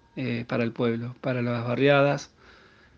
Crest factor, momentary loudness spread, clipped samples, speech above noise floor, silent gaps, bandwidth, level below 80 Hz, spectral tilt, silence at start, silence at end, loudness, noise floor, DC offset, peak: 20 dB; 11 LU; under 0.1%; 29 dB; none; 7.2 kHz; -64 dBFS; -7 dB/octave; 0.15 s; 0.7 s; -26 LUFS; -54 dBFS; under 0.1%; -8 dBFS